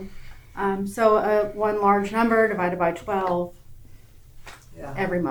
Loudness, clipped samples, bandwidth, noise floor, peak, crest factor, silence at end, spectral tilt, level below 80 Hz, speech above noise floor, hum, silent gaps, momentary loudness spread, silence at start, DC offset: -23 LUFS; under 0.1%; over 20 kHz; -46 dBFS; -6 dBFS; 18 dB; 0 s; -6.5 dB/octave; -46 dBFS; 24 dB; none; none; 15 LU; 0 s; under 0.1%